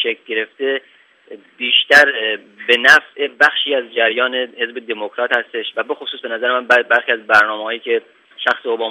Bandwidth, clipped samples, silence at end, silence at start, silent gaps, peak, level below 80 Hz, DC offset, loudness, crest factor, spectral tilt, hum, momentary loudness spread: 16 kHz; under 0.1%; 0 s; 0 s; none; 0 dBFS; -64 dBFS; under 0.1%; -15 LUFS; 16 dB; -1.5 dB/octave; none; 14 LU